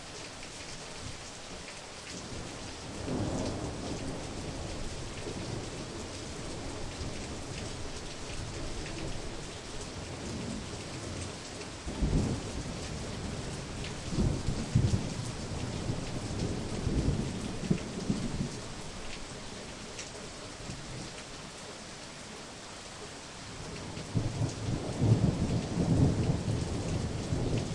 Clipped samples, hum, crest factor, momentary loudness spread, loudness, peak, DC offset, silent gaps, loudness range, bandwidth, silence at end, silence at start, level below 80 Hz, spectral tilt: under 0.1%; none; 22 dB; 11 LU; -36 LUFS; -14 dBFS; under 0.1%; none; 11 LU; 11.5 kHz; 0 s; 0 s; -44 dBFS; -5.5 dB/octave